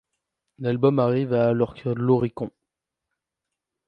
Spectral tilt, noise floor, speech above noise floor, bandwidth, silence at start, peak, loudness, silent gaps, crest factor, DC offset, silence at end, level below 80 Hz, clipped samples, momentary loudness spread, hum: -10.5 dB/octave; -85 dBFS; 63 dB; 5.4 kHz; 0.6 s; -6 dBFS; -23 LUFS; none; 20 dB; under 0.1%; 1.4 s; -60 dBFS; under 0.1%; 11 LU; none